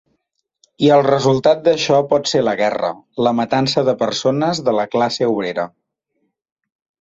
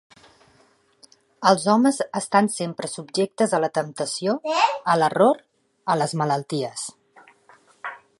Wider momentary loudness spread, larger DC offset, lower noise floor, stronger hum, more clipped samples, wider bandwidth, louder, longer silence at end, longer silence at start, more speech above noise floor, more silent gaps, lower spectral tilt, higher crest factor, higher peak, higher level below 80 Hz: second, 7 LU vs 13 LU; neither; first, -71 dBFS vs -60 dBFS; neither; neither; second, 8 kHz vs 11.5 kHz; first, -16 LUFS vs -22 LUFS; first, 1.35 s vs 0.2 s; second, 0.8 s vs 1.4 s; first, 56 dB vs 38 dB; neither; about the same, -5 dB/octave vs -4.5 dB/octave; second, 16 dB vs 22 dB; about the same, -2 dBFS vs -2 dBFS; first, -58 dBFS vs -74 dBFS